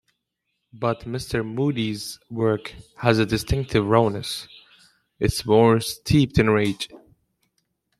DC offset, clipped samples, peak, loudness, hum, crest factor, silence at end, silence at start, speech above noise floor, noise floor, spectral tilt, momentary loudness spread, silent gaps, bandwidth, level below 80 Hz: under 0.1%; under 0.1%; -2 dBFS; -22 LUFS; none; 20 dB; 1 s; 0.75 s; 56 dB; -78 dBFS; -6 dB/octave; 14 LU; none; 14.5 kHz; -42 dBFS